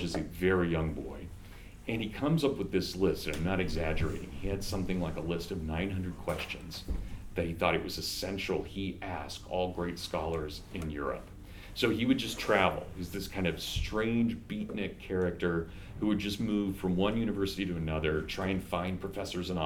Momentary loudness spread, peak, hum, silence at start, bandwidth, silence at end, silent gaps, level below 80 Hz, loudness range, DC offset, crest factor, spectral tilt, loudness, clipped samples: 10 LU; -10 dBFS; none; 0 s; 19 kHz; 0 s; none; -46 dBFS; 4 LU; under 0.1%; 22 dB; -5.5 dB/octave; -33 LUFS; under 0.1%